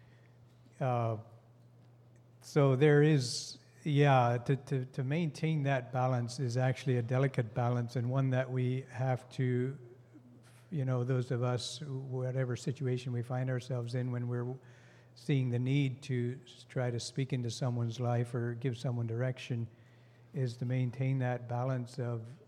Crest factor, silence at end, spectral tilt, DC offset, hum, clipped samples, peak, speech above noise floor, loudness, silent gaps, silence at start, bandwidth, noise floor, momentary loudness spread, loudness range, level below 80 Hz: 20 dB; 0.05 s; -7 dB/octave; under 0.1%; none; under 0.1%; -14 dBFS; 27 dB; -34 LUFS; none; 0.8 s; 11 kHz; -60 dBFS; 10 LU; 6 LU; -80 dBFS